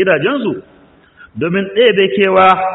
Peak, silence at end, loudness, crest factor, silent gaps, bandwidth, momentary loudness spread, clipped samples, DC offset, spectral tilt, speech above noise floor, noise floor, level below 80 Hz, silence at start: 0 dBFS; 0 s; -12 LUFS; 14 dB; none; 4.1 kHz; 13 LU; under 0.1%; under 0.1%; -7.5 dB/octave; 33 dB; -45 dBFS; -54 dBFS; 0 s